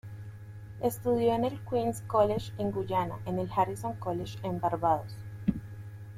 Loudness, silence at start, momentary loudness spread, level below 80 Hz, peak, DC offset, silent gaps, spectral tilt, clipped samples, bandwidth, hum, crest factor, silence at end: -31 LUFS; 0.05 s; 18 LU; -54 dBFS; -12 dBFS; under 0.1%; none; -7 dB/octave; under 0.1%; 16 kHz; none; 18 dB; 0 s